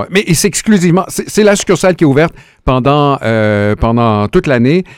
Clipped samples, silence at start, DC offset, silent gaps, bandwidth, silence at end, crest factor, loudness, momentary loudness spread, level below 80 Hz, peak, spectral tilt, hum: 0.2%; 0 s; 0.2%; none; 17.5 kHz; 0.05 s; 10 dB; -11 LUFS; 4 LU; -30 dBFS; 0 dBFS; -5.5 dB/octave; none